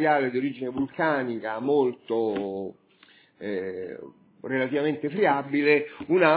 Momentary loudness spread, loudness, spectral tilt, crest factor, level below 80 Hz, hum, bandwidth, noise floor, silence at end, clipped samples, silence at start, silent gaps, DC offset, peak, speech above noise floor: 14 LU; -26 LUFS; -10 dB/octave; 20 dB; -68 dBFS; none; 4 kHz; -57 dBFS; 0 s; under 0.1%; 0 s; none; under 0.1%; -4 dBFS; 32 dB